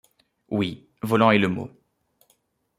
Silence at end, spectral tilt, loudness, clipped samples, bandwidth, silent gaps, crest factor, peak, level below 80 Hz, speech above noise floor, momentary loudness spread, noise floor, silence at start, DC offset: 1.1 s; -7 dB/octave; -23 LUFS; under 0.1%; 15 kHz; none; 22 dB; -4 dBFS; -64 dBFS; 46 dB; 16 LU; -67 dBFS; 0.5 s; under 0.1%